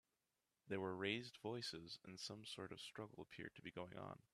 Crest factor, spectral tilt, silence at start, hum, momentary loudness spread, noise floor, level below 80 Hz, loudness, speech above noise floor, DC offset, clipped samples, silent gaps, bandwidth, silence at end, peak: 24 dB; -4.5 dB/octave; 0.65 s; none; 10 LU; under -90 dBFS; -84 dBFS; -51 LUFS; over 39 dB; under 0.1%; under 0.1%; none; 13 kHz; 0.15 s; -28 dBFS